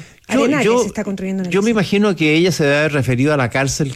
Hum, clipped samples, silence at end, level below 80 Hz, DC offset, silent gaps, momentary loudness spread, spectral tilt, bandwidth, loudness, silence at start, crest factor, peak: none; under 0.1%; 0 s; -46 dBFS; under 0.1%; none; 7 LU; -5.5 dB/octave; 15.5 kHz; -16 LUFS; 0 s; 10 dB; -4 dBFS